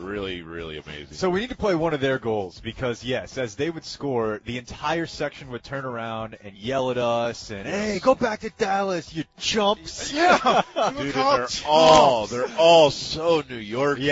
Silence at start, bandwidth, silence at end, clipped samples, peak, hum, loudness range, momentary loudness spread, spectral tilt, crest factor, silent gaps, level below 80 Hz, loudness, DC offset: 0 s; 8 kHz; 0 s; under 0.1%; -2 dBFS; none; 10 LU; 17 LU; -4 dB/octave; 20 dB; none; -50 dBFS; -22 LUFS; under 0.1%